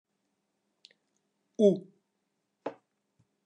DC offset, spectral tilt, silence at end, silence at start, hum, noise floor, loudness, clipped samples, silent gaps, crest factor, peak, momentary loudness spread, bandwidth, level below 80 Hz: under 0.1%; -8 dB/octave; 0.75 s; 1.6 s; none; -81 dBFS; -27 LUFS; under 0.1%; none; 24 dB; -10 dBFS; 18 LU; 9 kHz; under -90 dBFS